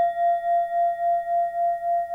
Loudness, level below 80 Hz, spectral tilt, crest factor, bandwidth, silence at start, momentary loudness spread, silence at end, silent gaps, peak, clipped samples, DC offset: -23 LUFS; -66 dBFS; -4 dB/octave; 8 dB; 3.7 kHz; 0 s; 3 LU; 0 s; none; -16 dBFS; under 0.1%; under 0.1%